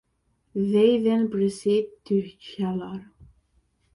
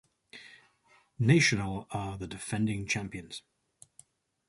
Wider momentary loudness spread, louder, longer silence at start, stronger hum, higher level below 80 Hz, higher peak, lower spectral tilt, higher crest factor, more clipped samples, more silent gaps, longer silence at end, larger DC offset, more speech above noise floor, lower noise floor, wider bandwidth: second, 16 LU vs 26 LU; first, -24 LUFS vs -30 LUFS; first, 0.55 s vs 0.35 s; neither; second, -62 dBFS vs -56 dBFS; about the same, -8 dBFS vs -10 dBFS; first, -7 dB/octave vs -5 dB/octave; about the same, 18 dB vs 22 dB; neither; neither; second, 0.7 s vs 1.1 s; neither; first, 47 dB vs 36 dB; first, -70 dBFS vs -66 dBFS; about the same, 11.5 kHz vs 11.5 kHz